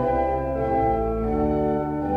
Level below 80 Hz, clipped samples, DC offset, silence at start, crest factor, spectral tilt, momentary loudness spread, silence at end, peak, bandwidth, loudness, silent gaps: -34 dBFS; under 0.1%; under 0.1%; 0 s; 12 dB; -10 dB/octave; 3 LU; 0 s; -12 dBFS; 6.2 kHz; -23 LUFS; none